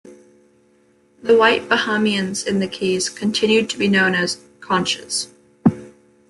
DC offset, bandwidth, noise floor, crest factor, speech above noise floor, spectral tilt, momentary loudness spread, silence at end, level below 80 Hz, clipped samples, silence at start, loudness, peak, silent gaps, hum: under 0.1%; 12 kHz; -57 dBFS; 18 dB; 38 dB; -4 dB/octave; 9 LU; 0.4 s; -60 dBFS; under 0.1%; 0.05 s; -18 LUFS; -2 dBFS; none; none